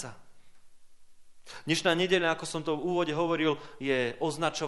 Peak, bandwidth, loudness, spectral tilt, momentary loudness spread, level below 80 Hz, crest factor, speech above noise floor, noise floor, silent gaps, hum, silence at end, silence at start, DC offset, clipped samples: -10 dBFS; 11.5 kHz; -29 LUFS; -4.5 dB/octave; 8 LU; -64 dBFS; 20 dB; 20 dB; -49 dBFS; none; none; 0 s; 0 s; under 0.1%; under 0.1%